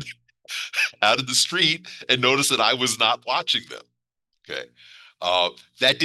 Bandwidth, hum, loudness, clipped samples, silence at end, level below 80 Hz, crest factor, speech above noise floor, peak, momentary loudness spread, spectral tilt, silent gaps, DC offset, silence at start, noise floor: 13 kHz; none; -21 LUFS; under 0.1%; 0 s; -70 dBFS; 22 dB; 56 dB; -2 dBFS; 15 LU; -1.5 dB/octave; none; under 0.1%; 0 s; -78 dBFS